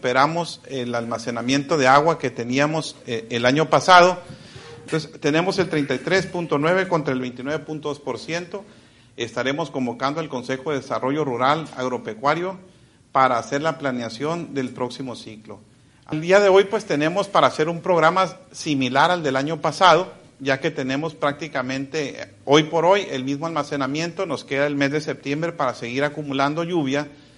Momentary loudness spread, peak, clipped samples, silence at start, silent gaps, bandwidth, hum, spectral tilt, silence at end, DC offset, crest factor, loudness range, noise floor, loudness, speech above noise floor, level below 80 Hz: 13 LU; -2 dBFS; under 0.1%; 0.05 s; none; 11.5 kHz; none; -5 dB/octave; 0.25 s; under 0.1%; 20 dB; 6 LU; -41 dBFS; -21 LUFS; 20 dB; -60 dBFS